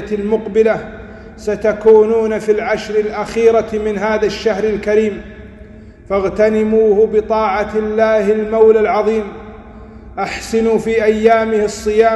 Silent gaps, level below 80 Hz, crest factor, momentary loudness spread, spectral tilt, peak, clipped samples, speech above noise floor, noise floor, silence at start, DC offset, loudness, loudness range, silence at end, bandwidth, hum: none; -40 dBFS; 14 dB; 12 LU; -5.5 dB/octave; 0 dBFS; under 0.1%; 23 dB; -36 dBFS; 0 s; under 0.1%; -14 LUFS; 3 LU; 0 s; 11.5 kHz; none